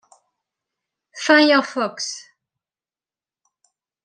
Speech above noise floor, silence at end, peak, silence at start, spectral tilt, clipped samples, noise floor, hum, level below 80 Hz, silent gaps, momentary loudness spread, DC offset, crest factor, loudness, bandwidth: over 73 dB; 1.85 s; -2 dBFS; 1.15 s; -2 dB/octave; under 0.1%; under -90 dBFS; none; -78 dBFS; none; 15 LU; under 0.1%; 22 dB; -18 LUFS; 10 kHz